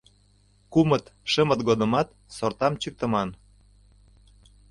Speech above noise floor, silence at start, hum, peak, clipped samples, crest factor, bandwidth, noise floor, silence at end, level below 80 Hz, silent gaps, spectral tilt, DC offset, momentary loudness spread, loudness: 36 dB; 0.7 s; 50 Hz at -50 dBFS; -6 dBFS; under 0.1%; 20 dB; 11.5 kHz; -60 dBFS; 1.35 s; -54 dBFS; none; -6 dB/octave; under 0.1%; 9 LU; -25 LUFS